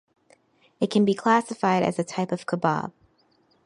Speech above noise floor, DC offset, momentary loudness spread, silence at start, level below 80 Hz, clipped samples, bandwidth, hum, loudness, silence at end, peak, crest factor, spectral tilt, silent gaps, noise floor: 41 dB; under 0.1%; 8 LU; 0.8 s; -70 dBFS; under 0.1%; 11 kHz; none; -24 LUFS; 0.75 s; -6 dBFS; 20 dB; -6 dB/octave; none; -64 dBFS